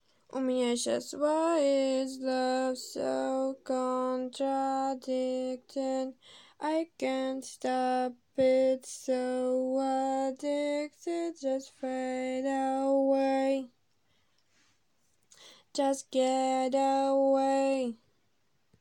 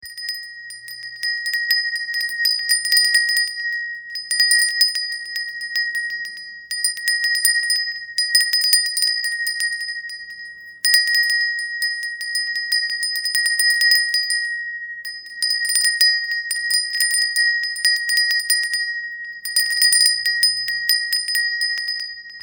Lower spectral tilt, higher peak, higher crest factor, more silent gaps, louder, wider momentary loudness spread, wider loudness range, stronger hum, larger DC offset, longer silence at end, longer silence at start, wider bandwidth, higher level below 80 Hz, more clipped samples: first, -3 dB/octave vs 6 dB/octave; second, -16 dBFS vs 0 dBFS; second, 14 dB vs 20 dB; neither; second, -31 LUFS vs -17 LUFS; second, 8 LU vs 14 LU; about the same, 4 LU vs 3 LU; neither; neither; first, 0.85 s vs 0 s; first, 0.35 s vs 0 s; second, 16 kHz vs over 20 kHz; second, -80 dBFS vs -74 dBFS; neither